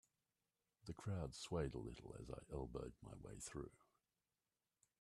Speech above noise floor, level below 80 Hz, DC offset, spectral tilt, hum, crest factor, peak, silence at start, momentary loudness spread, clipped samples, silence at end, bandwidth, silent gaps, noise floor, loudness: over 40 dB; -64 dBFS; under 0.1%; -5.5 dB/octave; none; 22 dB; -30 dBFS; 0.85 s; 11 LU; under 0.1%; 1.15 s; 13 kHz; none; under -90 dBFS; -51 LUFS